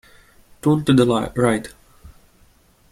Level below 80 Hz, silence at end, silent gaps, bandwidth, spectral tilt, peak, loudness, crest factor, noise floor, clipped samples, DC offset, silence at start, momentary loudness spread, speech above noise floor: -48 dBFS; 0.85 s; none; 15.5 kHz; -6.5 dB/octave; -2 dBFS; -19 LUFS; 20 dB; -54 dBFS; under 0.1%; under 0.1%; 0.65 s; 9 LU; 37 dB